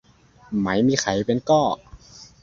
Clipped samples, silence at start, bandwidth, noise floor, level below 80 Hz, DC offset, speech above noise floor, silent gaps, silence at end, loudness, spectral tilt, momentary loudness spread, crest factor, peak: under 0.1%; 0.5 s; 7.8 kHz; -45 dBFS; -52 dBFS; under 0.1%; 25 dB; none; 0.2 s; -21 LUFS; -5 dB/octave; 8 LU; 18 dB; -4 dBFS